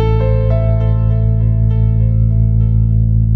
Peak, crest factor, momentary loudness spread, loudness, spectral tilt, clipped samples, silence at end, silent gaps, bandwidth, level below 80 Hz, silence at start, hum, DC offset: -4 dBFS; 8 dB; 1 LU; -14 LUFS; -12 dB/octave; under 0.1%; 0 s; none; 3.6 kHz; -16 dBFS; 0 s; none; under 0.1%